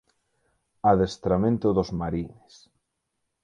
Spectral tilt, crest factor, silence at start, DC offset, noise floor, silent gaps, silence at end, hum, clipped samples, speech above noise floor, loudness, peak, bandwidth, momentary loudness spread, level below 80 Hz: -8 dB/octave; 20 dB; 0.85 s; under 0.1%; -79 dBFS; none; 1.15 s; none; under 0.1%; 55 dB; -25 LUFS; -6 dBFS; 9.6 kHz; 10 LU; -48 dBFS